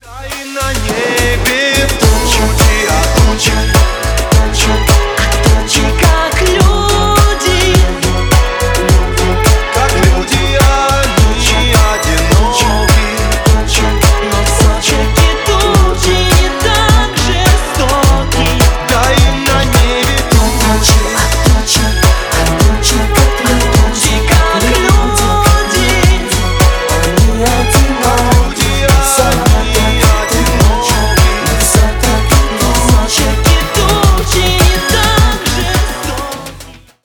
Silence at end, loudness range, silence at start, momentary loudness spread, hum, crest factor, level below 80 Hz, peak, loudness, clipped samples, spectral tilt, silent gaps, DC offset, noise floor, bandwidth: 0.3 s; 1 LU; 0.05 s; 3 LU; none; 10 dB; -14 dBFS; 0 dBFS; -10 LUFS; under 0.1%; -4 dB/octave; none; under 0.1%; -33 dBFS; over 20 kHz